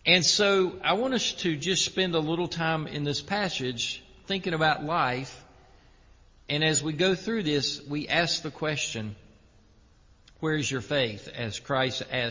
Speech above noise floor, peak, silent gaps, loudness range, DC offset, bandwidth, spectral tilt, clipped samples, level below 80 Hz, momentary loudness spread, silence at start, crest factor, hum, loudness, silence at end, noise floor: 31 dB; -6 dBFS; none; 4 LU; under 0.1%; 7.6 kHz; -3.5 dB/octave; under 0.1%; -56 dBFS; 9 LU; 0.05 s; 22 dB; none; -27 LUFS; 0 s; -58 dBFS